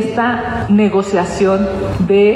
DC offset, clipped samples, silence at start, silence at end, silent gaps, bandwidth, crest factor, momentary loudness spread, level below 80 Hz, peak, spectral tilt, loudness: under 0.1%; under 0.1%; 0 s; 0 s; none; 11 kHz; 12 dB; 5 LU; -36 dBFS; -2 dBFS; -7 dB/octave; -14 LUFS